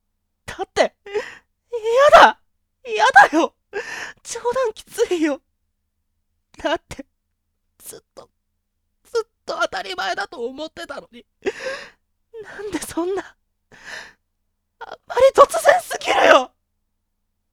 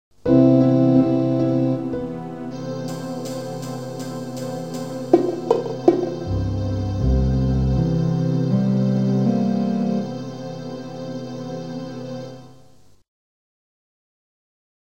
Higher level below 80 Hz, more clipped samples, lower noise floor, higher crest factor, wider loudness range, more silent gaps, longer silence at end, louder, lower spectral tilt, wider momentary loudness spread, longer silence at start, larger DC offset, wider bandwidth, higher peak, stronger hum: second, -54 dBFS vs -34 dBFS; neither; first, -73 dBFS vs -52 dBFS; about the same, 20 dB vs 22 dB; about the same, 15 LU vs 14 LU; neither; second, 1.05 s vs 2.5 s; first, -18 LUFS vs -21 LUFS; second, -2.5 dB/octave vs -8.5 dB/octave; first, 24 LU vs 15 LU; first, 0.5 s vs 0.25 s; second, under 0.1% vs 0.4%; about the same, 17 kHz vs 15.5 kHz; about the same, 0 dBFS vs 0 dBFS; neither